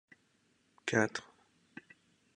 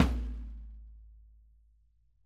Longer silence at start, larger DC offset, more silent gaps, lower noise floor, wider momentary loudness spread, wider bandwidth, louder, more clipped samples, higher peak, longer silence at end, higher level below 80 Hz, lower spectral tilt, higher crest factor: first, 0.85 s vs 0 s; neither; neither; first, -73 dBFS vs -67 dBFS; about the same, 23 LU vs 24 LU; about the same, 11 kHz vs 11 kHz; about the same, -35 LUFS vs -37 LUFS; neither; second, -14 dBFS vs -10 dBFS; about the same, 1.15 s vs 1.05 s; second, -78 dBFS vs -40 dBFS; second, -4.5 dB/octave vs -6.5 dB/octave; about the same, 26 dB vs 26 dB